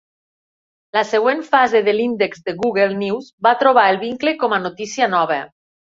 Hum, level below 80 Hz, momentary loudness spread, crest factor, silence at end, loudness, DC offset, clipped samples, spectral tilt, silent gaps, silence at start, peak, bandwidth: none; -64 dBFS; 9 LU; 16 dB; 0.45 s; -17 LUFS; under 0.1%; under 0.1%; -4.5 dB/octave; 3.33-3.38 s; 0.95 s; -2 dBFS; 7.8 kHz